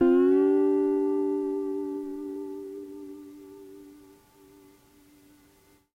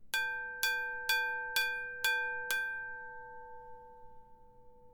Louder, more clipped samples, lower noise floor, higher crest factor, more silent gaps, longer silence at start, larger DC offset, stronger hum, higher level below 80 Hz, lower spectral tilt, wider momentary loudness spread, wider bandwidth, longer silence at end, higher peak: first, -26 LUFS vs -34 LUFS; neither; first, -61 dBFS vs -57 dBFS; second, 16 dB vs 24 dB; neither; about the same, 0 s vs 0 s; neither; neither; about the same, -66 dBFS vs -66 dBFS; first, -7 dB/octave vs 1.5 dB/octave; first, 26 LU vs 19 LU; second, 4.9 kHz vs 19 kHz; first, 2.05 s vs 0 s; about the same, -12 dBFS vs -14 dBFS